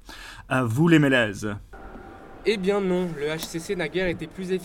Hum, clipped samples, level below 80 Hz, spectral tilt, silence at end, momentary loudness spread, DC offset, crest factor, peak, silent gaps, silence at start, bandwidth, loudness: none; under 0.1%; -48 dBFS; -6 dB/octave; 0 s; 24 LU; under 0.1%; 20 dB; -6 dBFS; none; 0.05 s; 18 kHz; -24 LUFS